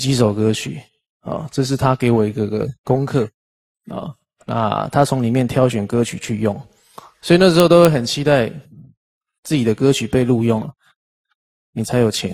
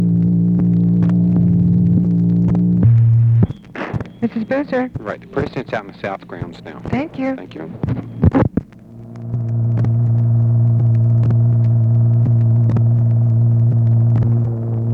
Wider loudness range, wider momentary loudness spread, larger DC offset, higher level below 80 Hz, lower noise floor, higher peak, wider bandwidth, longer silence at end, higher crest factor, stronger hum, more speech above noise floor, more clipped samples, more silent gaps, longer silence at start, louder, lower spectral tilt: second, 5 LU vs 9 LU; first, 19 LU vs 12 LU; neither; second, -48 dBFS vs -38 dBFS; first, -44 dBFS vs -36 dBFS; about the same, 0 dBFS vs 0 dBFS; first, 14.5 kHz vs 4.2 kHz; about the same, 0 s vs 0 s; about the same, 18 dB vs 14 dB; neither; first, 27 dB vs 14 dB; neither; first, 1.10-1.20 s, 2.78-2.84 s, 3.34-3.75 s, 8.97-9.21 s, 9.38-9.43 s, 10.96-11.24 s, 11.35-11.73 s vs none; about the same, 0 s vs 0 s; about the same, -17 LUFS vs -16 LUFS; second, -6 dB/octave vs -11 dB/octave